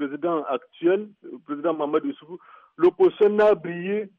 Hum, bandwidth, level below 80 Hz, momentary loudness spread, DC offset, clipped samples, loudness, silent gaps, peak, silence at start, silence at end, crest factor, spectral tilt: none; 4.7 kHz; -68 dBFS; 21 LU; under 0.1%; under 0.1%; -23 LUFS; none; -10 dBFS; 0 s; 0.1 s; 14 dB; -8.5 dB/octave